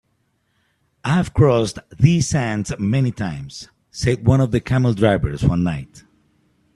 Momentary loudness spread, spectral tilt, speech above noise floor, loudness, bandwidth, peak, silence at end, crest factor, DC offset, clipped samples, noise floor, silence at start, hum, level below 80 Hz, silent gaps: 13 LU; -6.5 dB/octave; 49 dB; -19 LUFS; 11.5 kHz; 0 dBFS; 0.75 s; 20 dB; under 0.1%; under 0.1%; -67 dBFS; 1.05 s; none; -38 dBFS; none